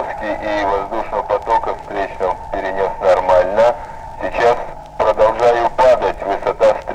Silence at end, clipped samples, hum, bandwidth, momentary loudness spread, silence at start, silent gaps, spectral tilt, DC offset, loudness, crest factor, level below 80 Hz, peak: 0 s; under 0.1%; none; 10 kHz; 10 LU; 0 s; none; -5 dB/octave; under 0.1%; -16 LUFS; 14 dB; -36 dBFS; -2 dBFS